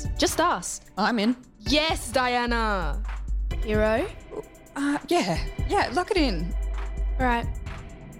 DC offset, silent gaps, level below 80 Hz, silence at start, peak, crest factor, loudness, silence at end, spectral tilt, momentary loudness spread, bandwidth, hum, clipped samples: under 0.1%; none; -32 dBFS; 0 s; -10 dBFS; 14 dB; -26 LUFS; 0 s; -4.5 dB/octave; 11 LU; 16 kHz; none; under 0.1%